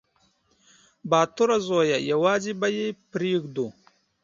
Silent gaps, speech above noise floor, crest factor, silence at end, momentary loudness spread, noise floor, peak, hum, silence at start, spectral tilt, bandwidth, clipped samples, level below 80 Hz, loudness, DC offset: none; 43 dB; 20 dB; 0.55 s; 10 LU; -66 dBFS; -6 dBFS; none; 1.05 s; -5 dB/octave; 7.6 kHz; under 0.1%; -68 dBFS; -24 LUFS; under 0.1%